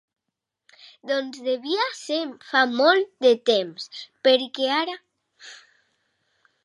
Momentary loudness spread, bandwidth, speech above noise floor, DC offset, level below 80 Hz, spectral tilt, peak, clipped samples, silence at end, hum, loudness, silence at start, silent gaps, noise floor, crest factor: 19 LU; 11.5 kHz; 61 dB; under 0.1%; -84 dBFS; -3 dB/octave; -4 dBFS; under 0.1%; 1.1 s; none; -22 LUFS; 1.05 s; none; -83 dBFS; 20 dB